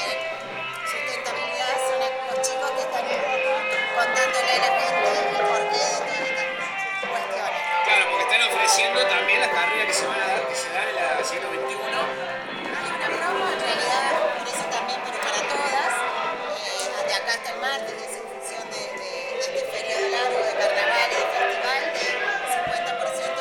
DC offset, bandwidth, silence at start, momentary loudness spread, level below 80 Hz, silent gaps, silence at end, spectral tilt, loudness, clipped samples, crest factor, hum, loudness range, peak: under 0.1%; 18 kHz; 0 s; 9 LU; -68 dBFS; none; 0 s; -0.5 dB/octave; -23 LUFS; under 0.1%; 18 dB; none; 6 LU; -6 dBFS